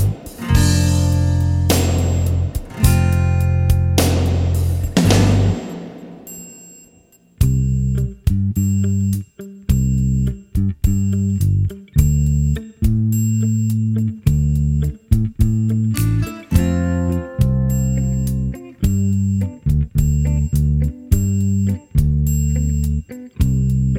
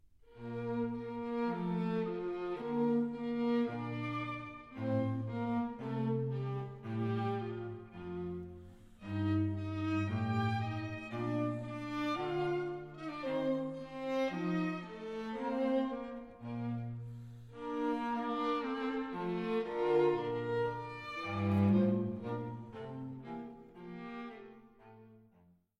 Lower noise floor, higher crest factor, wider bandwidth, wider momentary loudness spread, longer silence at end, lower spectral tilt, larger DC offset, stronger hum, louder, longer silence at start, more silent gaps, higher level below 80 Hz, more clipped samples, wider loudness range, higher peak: second, -51 dBFS vs -68 dBFS; about the same, 16 dB vs 18 dB; first, 16.5 kHz vs 9.4 kHz; second, 6 LU vs 13 LU; second, 0 s vs 0.6 s; second, -6.5 dB/octave vs -8.5 dB/octave; neither; neither; first, -18 LUFS vs -37 LUFS; second, 0 s vs 0.3 s; neither; first, -24 dBFS vs -66 dBFS; neither; about the same, 3 LU vs 5 LU; first, 0 dBFS vs -18 dBFS